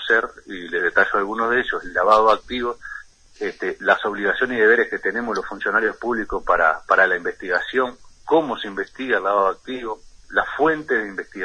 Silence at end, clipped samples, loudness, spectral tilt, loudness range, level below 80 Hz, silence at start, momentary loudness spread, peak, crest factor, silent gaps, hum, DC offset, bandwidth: 0 s; under 0.1%; -20 LUFS; -4.5 dB/octave; 3 LU; -48 dBFS; 0 s; 14 LU; -2 dBFS; 20 dB; none; none; under 0.1%; 10 kHz